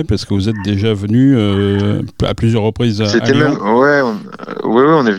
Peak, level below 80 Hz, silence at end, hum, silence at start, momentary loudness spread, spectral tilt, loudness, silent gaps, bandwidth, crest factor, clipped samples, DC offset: 0 dBFS; -40 dBFS; 0 s; none; 0 s; 7 LU; -7 dB/octave; -13 LUFS; none; 11 kHz; 12 dB; under 0.1%; under 0.1%